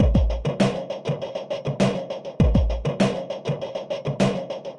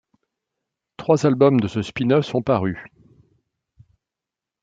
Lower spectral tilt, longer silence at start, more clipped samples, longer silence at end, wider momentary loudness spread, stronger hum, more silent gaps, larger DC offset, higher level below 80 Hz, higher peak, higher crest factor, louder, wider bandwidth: about the same, -7 dB/octave vs -7.5 dB/octave; second, 0 s vs 1 s; neither; second, 0 s vs 1.75 s; second, 9 LU vs 12 LU; neither; neither; neither; first, -30 dBFS vs -58 dBFS; second, -6 dBFS vs -2 dBFS; about the same, 16 dB vs 20 dB; second, -25 LUFS vs -20 LUFS; first, 11 kHz vs 7.8 kHz